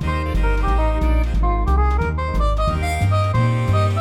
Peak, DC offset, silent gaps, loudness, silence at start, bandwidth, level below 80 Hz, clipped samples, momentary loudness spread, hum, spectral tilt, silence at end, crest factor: -8 dBFS; under 0.1%; none; -20 LUFS; 0 s; 12 kHz; -20 dBFS; under 0.1%; 3 LU; none; -7 dB/octave; 0 s; 10 dB